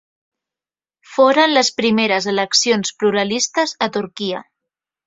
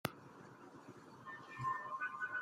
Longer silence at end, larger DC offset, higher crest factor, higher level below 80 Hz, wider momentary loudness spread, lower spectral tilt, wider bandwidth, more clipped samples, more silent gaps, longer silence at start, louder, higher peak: first, 0.65 s vs 0 s; neither; second, 16 dB vs 28 dB; first, -62 dBFS vs -80 dBFS; second, 11 LU vs 16 LU; second, -2.5 dB/octave vs -4.5 dB/octave; second, 8 kHz vs 15.5 kHz; neither; neither; first, 1.1 s vs 0.05 s; first, -16 LUFS vs -44 LUFS; first, -2 dBFS vs -18 dBFS